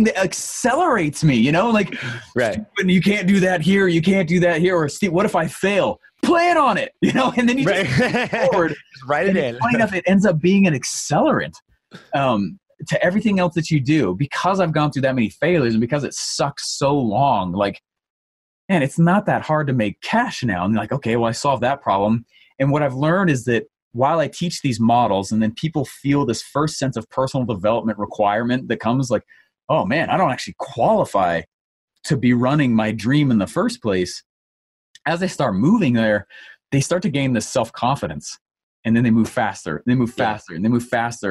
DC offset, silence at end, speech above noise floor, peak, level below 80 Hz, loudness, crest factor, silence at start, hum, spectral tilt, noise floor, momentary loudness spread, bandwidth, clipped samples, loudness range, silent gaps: under 0.1%; 0 s; over 72 dB; -6 dBFS; -52 dBFS; -19 LUFS; 14 dB; 0 s; none; -5.5 dB/octave; under -90 dBFS; 7 LU; 12.5 kHz; under 0.1%; 3 LU; 18.10-18.68 s, 23.82-23.91 s, 29.64-29.68 s, 31.48-31.88 s, 34.26-34.94 s, 38.41-38.46 s, 38.63-38.83 s